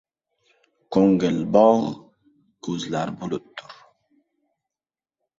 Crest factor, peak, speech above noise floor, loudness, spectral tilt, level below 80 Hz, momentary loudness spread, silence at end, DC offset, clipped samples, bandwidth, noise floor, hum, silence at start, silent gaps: 22 dB; -2 dBFS; over 70 dB; -21 LUFS; -7 dB/octave; -62 dBFS; 21 LU; 1.65 s; under 0.1%; under 0.1%; 7.8 kHz; under -90 dBFS; none; 0.9 s; none